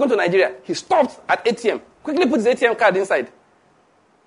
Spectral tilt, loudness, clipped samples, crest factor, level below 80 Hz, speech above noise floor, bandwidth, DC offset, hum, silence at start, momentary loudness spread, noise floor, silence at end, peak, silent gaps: -4.5 dB/octave; -19 LUFS; under 0.1%; 18 dB; -66 dBFS; 39 dB; 11 kHz; under 0.1%; none; 0 s; 8 LU; -57 dBFS; 1 s; -2 dBFS; none